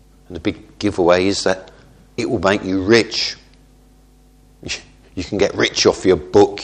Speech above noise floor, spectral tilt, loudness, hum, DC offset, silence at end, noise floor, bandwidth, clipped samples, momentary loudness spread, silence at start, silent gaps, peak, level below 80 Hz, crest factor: 33 dB; -4 dB/octave; -17 LUFS; none; under 0.1%; 0 s; -49 dBFS; 10 kHz; under 0.1%; 16 LU; 0.3 s; none; 0 dBFS; -44 dBFS; 18 dB